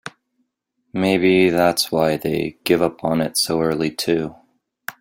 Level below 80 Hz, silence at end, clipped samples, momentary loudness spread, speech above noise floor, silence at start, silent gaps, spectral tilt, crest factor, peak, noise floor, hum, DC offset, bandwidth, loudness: -54 dBFS; 0.1 s; under 0.1%; 16 LU; 53 dB; 0.05 s; none; -4.5 dB/octave; 18 dB; -2 dBFS; -72 dBFS; none; under 0.1%; 16.5 kHz; -19 LUFS